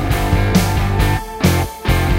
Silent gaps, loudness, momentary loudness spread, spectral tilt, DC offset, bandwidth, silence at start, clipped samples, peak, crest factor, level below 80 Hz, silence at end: none; -16 LUFS; 3 LU; -5.5 dB/octave; under 0.1%; 16.5 kHz; 0 s; under 0.1%; -2 dBFS; 14 dB; -22 dBFS; 0 s